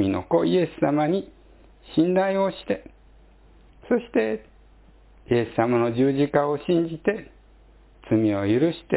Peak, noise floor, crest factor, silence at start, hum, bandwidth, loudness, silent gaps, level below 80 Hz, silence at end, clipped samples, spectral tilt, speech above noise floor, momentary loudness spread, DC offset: -6 dBFS; -52 dBFS; 18 dB; 0 s; none; 4 kHz; -23 LUFS; none; -52 dBFS; 0 s; under 0.1%; -11.5 dB/octave; 30 dB; 8 LU; under 0.1%